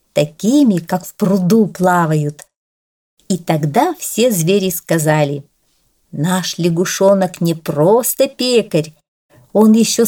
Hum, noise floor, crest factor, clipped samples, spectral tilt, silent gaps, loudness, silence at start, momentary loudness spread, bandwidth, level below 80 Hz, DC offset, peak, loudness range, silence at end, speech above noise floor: none; -60 dBFS; 14 dB; under 0.1%; -5.5 dB/octave; 2.57-3.17 s, 9.08-9.29 s; -15 LUFS; 0.15 s; 8 LU; 19 kHz; -58 dBFS; under 0.1%; -2 dBFS; 2 LU; 0 s; 46 dB